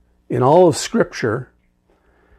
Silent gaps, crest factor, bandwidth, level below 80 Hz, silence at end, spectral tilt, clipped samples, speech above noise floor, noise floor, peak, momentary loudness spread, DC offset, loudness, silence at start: none; 16 dB; 13.5 kHz; -54 dBFS; 0.95 s; -5.5 dB/octave; under 0.1%; 44 dB; -59 dBFS; -2 dBFS; 13 LU; under 0.1%; -17 LUFS; 0.3 s